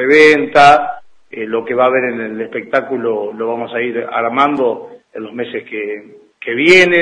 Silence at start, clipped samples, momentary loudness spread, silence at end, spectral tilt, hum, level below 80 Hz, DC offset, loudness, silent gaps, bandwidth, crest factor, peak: 0 s; 0.2%; 19 LU; 0 s; -4.5 dB/octave; none; -54 dBFS; under 0.1%; -13 LUFS; none; 11 kHz; 14 dB; 0 dBFS